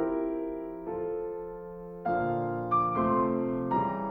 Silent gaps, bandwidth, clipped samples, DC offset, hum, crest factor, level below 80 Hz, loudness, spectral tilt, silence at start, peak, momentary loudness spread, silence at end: none; 4.6 kHz; under 0.1%; under 0.1%; none; 14 dB; -56 dBFS; -30 LUFS; -11 dB/octave; 0 s; -16 dBFS; 11 LU; 0 s